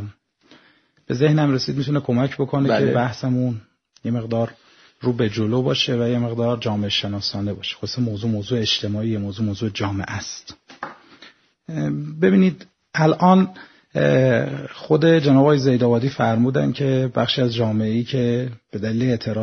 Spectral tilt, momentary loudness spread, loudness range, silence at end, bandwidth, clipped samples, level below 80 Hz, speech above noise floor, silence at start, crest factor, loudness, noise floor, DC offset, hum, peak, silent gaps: -6.5 dB/octave; 12 LU; 6 LU; 0 s; 6.6 kHz; under 0.1%; -56 dBFS; 38 dB; 0 s; 20 dB; -20 LUFS; -57 dBFS; under 0.1%; none; 0 dBFS; none